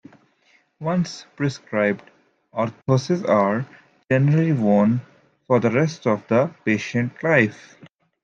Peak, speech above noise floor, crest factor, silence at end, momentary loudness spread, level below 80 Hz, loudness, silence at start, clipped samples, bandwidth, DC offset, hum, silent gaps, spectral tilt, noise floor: -2 dBFS; 41 dB; 20 dB; 0.7 s; 9 LU; -66 dBFS; -21 LUFS; 0.8 s; under 0.1%; 7.8 kHz; under 0.1%; none; none; -7.5 dB/octave; -61 dBFS